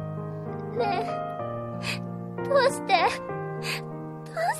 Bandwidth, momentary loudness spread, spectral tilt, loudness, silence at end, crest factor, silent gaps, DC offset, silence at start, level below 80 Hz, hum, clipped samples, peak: 14 kHz; 12 LU; -5 dB/octave; -28 LUFS; 0 s; 20 dB; none; under 0.1%; 0 s; -62 dBFS; none; under 0.1%; -8 dBFS